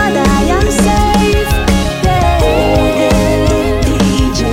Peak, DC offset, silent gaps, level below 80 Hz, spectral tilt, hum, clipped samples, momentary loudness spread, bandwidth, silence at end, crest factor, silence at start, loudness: 0 dBFS; under 0.1%; none; -16 dBFS; -5.5 dB/octave; none; under 0.1%; 2 LU; 16.5 kHz; 0 s; 10 dB; 0 s; -11 LUFS